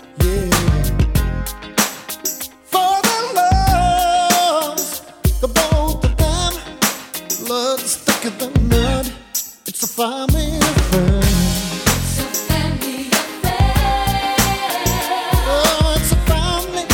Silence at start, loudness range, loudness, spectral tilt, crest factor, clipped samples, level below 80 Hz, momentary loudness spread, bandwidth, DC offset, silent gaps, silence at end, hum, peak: 0 s; 3 LU; -17 LUFS; -4 dB/octave; 16 dB; under 0.1%; -22 dBFS; 8 LU; 20 kHz; under 0.1%; none; 0 s; none; 0 dBFS